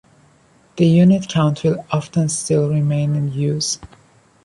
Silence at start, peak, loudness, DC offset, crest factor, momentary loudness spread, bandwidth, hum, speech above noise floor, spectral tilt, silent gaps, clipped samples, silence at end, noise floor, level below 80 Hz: 0.75 s; -4 dBFS; -18 LUFS; under 0.1%; 14 dB; 9 LU; 11.5 kHz; none; 37 dB; -6 dB/octave; none; under 0.1%; 0.6 s; -53 dBFS; -52 dBFS